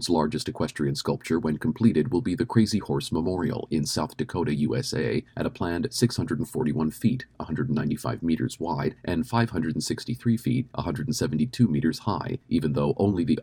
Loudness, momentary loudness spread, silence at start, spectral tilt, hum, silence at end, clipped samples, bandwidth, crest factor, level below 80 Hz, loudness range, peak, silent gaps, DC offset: -27 LUFS; 6 LU; 0 s; -6 dB/octave; none; 0 s; under 0.1%; 17.5 kHz; 20 dB; -50 dBFS; 2 LU; -6 dBFS; none; under 0.1%